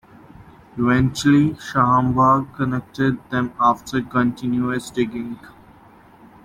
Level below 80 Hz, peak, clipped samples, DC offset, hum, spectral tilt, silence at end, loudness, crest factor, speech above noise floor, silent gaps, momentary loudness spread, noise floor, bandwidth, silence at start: -48 dBFS; -4 dBFS; under 0.1%; under 0.1%; none; -6.5 dB/octave; 0.95 s; -19 LUFS; 18 dB; 29 dB; none; 8 LU; -48 dBFS; 14.5 kHz; 0.4 s